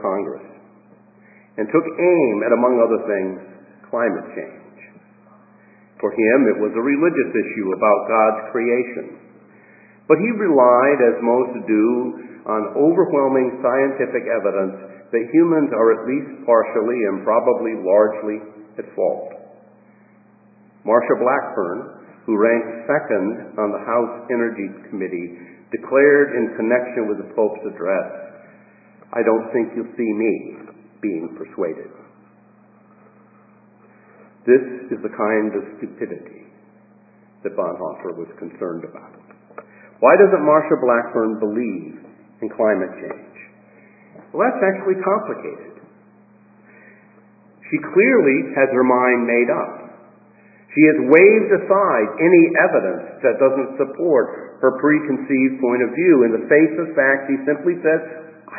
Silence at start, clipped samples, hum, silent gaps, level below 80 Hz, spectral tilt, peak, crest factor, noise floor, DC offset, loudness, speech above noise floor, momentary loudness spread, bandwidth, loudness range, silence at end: 0 s; under 0.1%; none; none; -72 dBFS; -12.5 dB/octave; 0 dBFS; 18 dB; -51 dBFS; under 0.1%; -18 LUFS; 34 dB; 17 LU; 2.7 kHz; 10 LU; 0 s